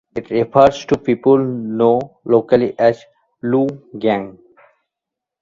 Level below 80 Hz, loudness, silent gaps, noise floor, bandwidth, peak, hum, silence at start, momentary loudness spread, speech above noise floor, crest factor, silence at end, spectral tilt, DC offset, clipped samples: -52 dBFS; -16 LUFS; none; -84 dBFS; 7.6 kHz; 0 dBFS; none; 0.15 s; 9 LU; 68 dB; 16 dB; 1.1 s; -7.5 dB/octave; under 0.1%; under 0.1%